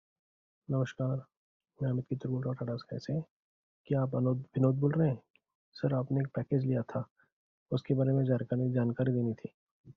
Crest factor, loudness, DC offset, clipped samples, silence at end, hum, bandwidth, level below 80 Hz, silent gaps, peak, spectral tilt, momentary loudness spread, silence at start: 20 dB; -33 LUFS; under 0.1%; under 0.1%; 0.05 s; none; 6.6 kHz; -68 dBFS; 1.37-1.60 s, 3.31-3.84 s, 5.30-5.34 s, 5.55-5.72 s, 7.11-7.16 s, 7.32-7.66 s, 9.54-9.84 s; -14 dBFS; -9 dB/octave; 10 LU; 0.7 s